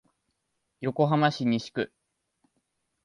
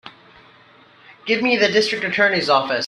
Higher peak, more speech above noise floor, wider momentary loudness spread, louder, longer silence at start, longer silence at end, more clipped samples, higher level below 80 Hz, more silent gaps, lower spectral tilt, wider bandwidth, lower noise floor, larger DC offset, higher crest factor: second, -8 dBFS vs -2 dBFS; first, 53 dB vs 32 dB; first, 11 LU vs 6 LU; second, -27 LUFS vs -17 LUFS; first, 0.8 s vs 0.05 s; first, 1.2 s vs 0 s; neither; about the same, -70 dBFS vs -66 dBFS; neither; first, -7 dB/octave vs -3.5 dB/octave; about the same, 11 kHz vs 11 kHz; first, -79 dBFS vs -50 dBFS; neither; about the same, 22 dB vs 18 dB